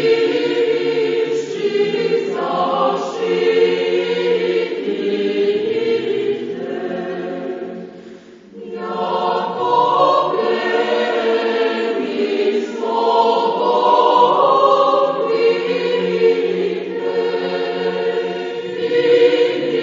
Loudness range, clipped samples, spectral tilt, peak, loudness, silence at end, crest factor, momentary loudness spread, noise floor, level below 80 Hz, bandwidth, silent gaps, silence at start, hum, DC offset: 7 LU; under 0.1%; -5.5 dB/octave; 0 dBFS; -17 LUFS; 0 s; 16 dB; 11 LU; -39 dBFS; -70 dBFS; 7.6 kHz; none; 0 s; none; under 0.1%